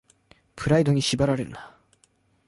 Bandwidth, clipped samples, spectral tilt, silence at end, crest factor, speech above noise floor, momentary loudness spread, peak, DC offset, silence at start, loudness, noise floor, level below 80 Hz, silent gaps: 11.5 kHz; under 0.1%; -5.5 dB/octave; 0.8 s; 18 dB; 42 dB; 15 LU; -8 dBFS; under 0.1%; 0.55 s; -23 LUFS; -65 dBFS; -50 dBFS; none